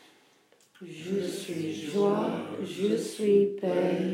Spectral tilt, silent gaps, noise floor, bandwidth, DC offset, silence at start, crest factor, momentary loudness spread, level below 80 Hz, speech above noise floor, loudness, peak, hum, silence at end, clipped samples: -6 dB/octave; none; -63 dBFS; 15.5 kHz; under 0.1%; 0.8 s; 18 dB; 12 LU; -86 dBFS; 35 dB; -29 LUFS; -12 dBFS; none; 0 s; under 0.1%